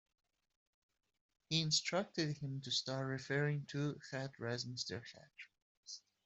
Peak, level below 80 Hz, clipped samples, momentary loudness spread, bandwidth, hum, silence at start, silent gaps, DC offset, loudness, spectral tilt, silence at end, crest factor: -22 dBFS; -78 dBFS; under 0.1%; 19 LU; 8.2 kHz; none; 1.5 s; 5.62-5.83 s; under 0.1%; -40 LUFS; -4 dB/octave; 0.25 s; 20 dB